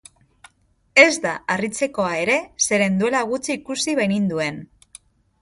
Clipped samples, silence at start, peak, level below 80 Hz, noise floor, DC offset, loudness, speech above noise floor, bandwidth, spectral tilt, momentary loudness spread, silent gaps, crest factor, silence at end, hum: under 0.1%; 0.95 s; 0 dBFS; -60 dBFS; -61 dBFS; under 0.1%; -19 LUFS; 41 dB; 11.5 kHz; -3.5 dB/octave; 12 LU; none; 22 dB; 0.75 s; none